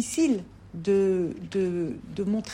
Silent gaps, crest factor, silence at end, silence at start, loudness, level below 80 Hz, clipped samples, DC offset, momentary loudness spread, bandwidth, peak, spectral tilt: none; 12 dB; 0 s; 0 s; -27 LUFS; -56 dBFS; under 0.1%; under 0.1%; 10 LU; 16 kHz; -14 dBFS; -6 dB/octave